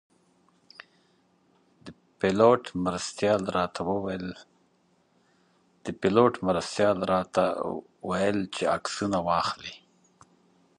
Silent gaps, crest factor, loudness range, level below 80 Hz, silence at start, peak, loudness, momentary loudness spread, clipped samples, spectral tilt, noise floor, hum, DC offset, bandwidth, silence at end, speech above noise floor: none; 22 dB; 4 LU; -58 dBFS; 1.85 s; -6 dBFS; -27 LUFS; 14 LU; under 0.1%; -5.5 dB/octave; -67 dBFS; none; under 0.1%; 11.5 kHz; 1 s; 41 dB